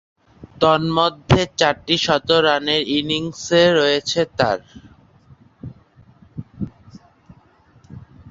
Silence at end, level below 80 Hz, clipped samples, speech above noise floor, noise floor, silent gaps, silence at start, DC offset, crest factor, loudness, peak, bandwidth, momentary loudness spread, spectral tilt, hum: 0.25 s; -46 dBFS; under 0.1%; 35 dB; -53 dBFS; none; 0.4 s; under 0.1%; 20 dB; -17 LUFS; 0 dBFS; 7.8 kHz; 22 LU; -4.5 dB/octave; none